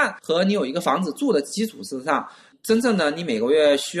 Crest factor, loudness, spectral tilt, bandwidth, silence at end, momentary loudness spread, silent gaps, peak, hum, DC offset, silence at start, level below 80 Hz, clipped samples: 16 dB; -22 LUFS; -4.5 dB/octave; 13 kHz; 0 s; 9 LU; none; -6 dBFS; none; under 0.1%; 0 s; -66 dBFS; under 0.1%